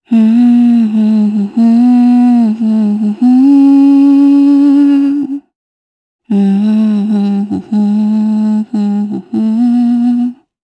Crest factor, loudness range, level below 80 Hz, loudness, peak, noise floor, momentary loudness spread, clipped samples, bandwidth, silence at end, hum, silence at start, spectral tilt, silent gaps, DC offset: 8 dB; 5 LU; -64 dBFS; -9 LUFS; 0 dBFS; under -90 dBFS; 9 LU; under 0.1%; 8.2 kHz; 0.3 s; none; 0.1 s; -9 dB/octave; 5.55-6.19 s; under 0.1%